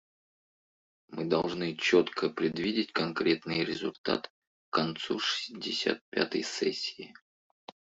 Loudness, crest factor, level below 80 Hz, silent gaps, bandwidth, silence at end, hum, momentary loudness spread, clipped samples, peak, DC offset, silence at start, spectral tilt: -31 LUFS; 22 dB; -70 dBFS; 3.98-4.04 s, 4.30-4.72 s, 6.01-6.12 s; 8 kHz; 0.75 s; none; 9 LU; under 0.1%; -10 dBFS; under 0.1%; 1.1 s; -4.5 dB/octave